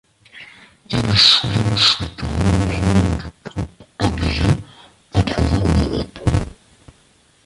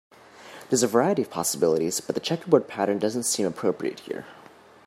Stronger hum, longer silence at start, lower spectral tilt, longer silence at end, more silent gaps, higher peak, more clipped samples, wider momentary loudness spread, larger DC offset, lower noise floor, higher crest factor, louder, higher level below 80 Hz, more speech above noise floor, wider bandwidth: neither; about the same, 0.35 s vs 0.4 s; about the same, -5 dB/octave vs -4 dB/octave; first, 0.95 s vs 0.55 s; neither; first, 0 dBFS vs -4 dBFS; neither; about the same, 16 LU vs 14 LU; neither; first, -55 dBFS vs -50 dBFS; about the same, 18 dB vs 22 dB; first, -17 LUFS vs -24 LUFS; first, -28 dBFS vs -70 dBFS; first, 38 dB vs 26 dB; second, 11.5 kHz vs 16 kHz